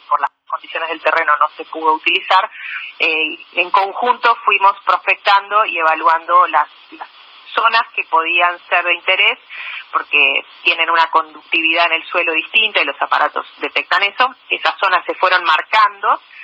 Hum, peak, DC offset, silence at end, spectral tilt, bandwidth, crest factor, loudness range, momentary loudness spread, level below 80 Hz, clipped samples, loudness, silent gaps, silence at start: none; 0 dBFS; under 0.1%; 0 s; -1.5 dB/octave; 7.8 kHz; 16 dB; 2 LU; 10 LU; -78 dBFS; under 0.1%; -14 LUFS; none; 0.1 s